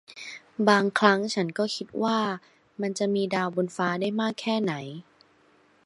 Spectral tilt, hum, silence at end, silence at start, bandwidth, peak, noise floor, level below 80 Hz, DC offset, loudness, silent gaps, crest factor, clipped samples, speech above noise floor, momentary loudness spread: -5 dB/octave; none; 0.85 s; 0.1 s; 11.5 kHz; -2 dBFS; -61 dBFS; -76 dBFS; under 0.1%; -26 LUFS; none; 24 dB; under 0.1%; 36 dB; 17 LU